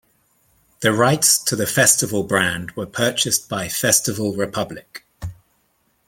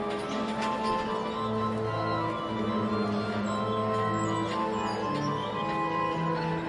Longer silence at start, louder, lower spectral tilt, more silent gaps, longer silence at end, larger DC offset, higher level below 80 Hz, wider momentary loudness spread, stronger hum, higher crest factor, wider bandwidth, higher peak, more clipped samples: first, 0.8 s vs 0 s; first, -18 LUFS vs -30 LUFS; second, -2.5 dB/octave vs -6 dB/octave; neither; first, 0.75 s vs 0 s; neither; about the same, -52 dBFS vs -56 dBFS; first, 17 LU vs 3 LU; neither; first, 20 dB vs 12 dB; first, 17 kHz vs 11.5 kHz; first, 0 dBFS vs -18 dBFS; neither